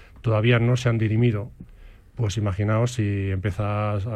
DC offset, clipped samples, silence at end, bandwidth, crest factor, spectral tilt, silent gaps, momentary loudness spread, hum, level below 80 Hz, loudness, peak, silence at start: under 0.1%; under 0.1%; 0 s; 9.2 kHz; 16 dB; -7 dB/octave; none; 9 LU; none; -46 dBFS; -23 LUFS; -6 dBFS; 0 s